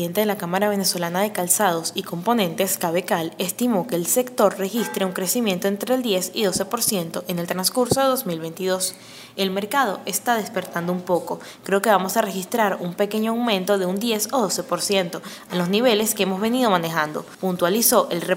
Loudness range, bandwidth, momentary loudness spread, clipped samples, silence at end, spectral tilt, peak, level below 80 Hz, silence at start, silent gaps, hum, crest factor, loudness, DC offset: 2 LU; 16.5 kHz; 8 LU; under 0.1%; 0 s; -3.5 dB/octave; -2 dBFS; -64 dBFS; 0 s; none; none; 20 dB; -22 LUFS; under 0.1%